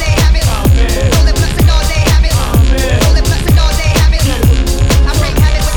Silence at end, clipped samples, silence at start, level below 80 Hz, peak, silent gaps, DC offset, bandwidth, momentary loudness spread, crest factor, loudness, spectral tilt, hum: 0 s; under 0.1%; 0 s; -10 dBFS; 0 dBFS; none; under 0.1%; 20 kHz; 1 LU; 8 dB; -11 LUFS; -5 dB/octave; none